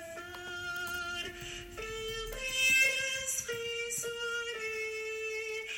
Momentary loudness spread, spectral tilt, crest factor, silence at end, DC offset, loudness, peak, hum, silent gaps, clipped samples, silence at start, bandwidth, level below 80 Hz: 16 LU; -0.5 dB/octave; 20 dB; 0 s; under 0.1%; -33 LUFS; -16 dBFS; none; none; under 0.1%; 0 s; 16.5 kHz; -56 dBFS